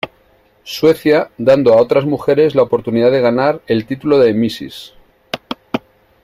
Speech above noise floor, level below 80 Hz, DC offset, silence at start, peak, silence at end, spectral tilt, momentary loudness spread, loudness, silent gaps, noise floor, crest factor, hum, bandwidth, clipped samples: 40 dB; -52 dBFS; under 0.1%; 0.05 s; 0 dBFS; 0.45 s; -6.5 dB/octave; 16 LU; -14 LUFS; none; -52 dBFS; 14 dB; none; 15.5 kHz; under 0.1%